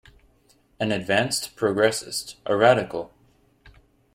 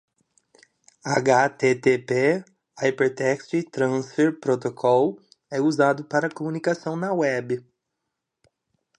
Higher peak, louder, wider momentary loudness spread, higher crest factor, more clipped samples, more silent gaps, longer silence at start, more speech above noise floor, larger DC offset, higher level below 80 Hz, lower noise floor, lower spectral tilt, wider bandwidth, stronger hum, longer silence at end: about the same, -4 dBFS vs -4 dBFS; about the same, -23 LUFS vs -23 LUFS; first, 13 LU vs 8 LU; about the same, 20 dB vs 20 dB; neither; neither; second, 0.8 s vs 1.05 s; second, 38 dB vs 59 dB; neither; first, -58 dBFS vs -72 dBFS; second, -61 dBFS vs -82 dBFS; second, -4 dB/octave vs -6 dB/octave; first, 16.5 kHz vs 10 kHz; neither; second, 0.45 s vs 1.4 s